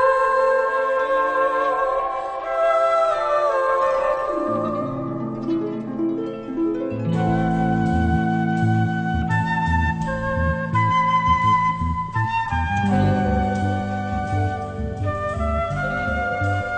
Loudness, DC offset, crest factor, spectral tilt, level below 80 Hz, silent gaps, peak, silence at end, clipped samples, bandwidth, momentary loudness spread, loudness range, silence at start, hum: -21 LUFS; under 0.1%; 14 dB; -7.5 dB/octave; -36 dBFS; none; -8 dBFS; 0 s; under 0.1%; 9 kHz; 7 LU; 4 LU; 0 s; none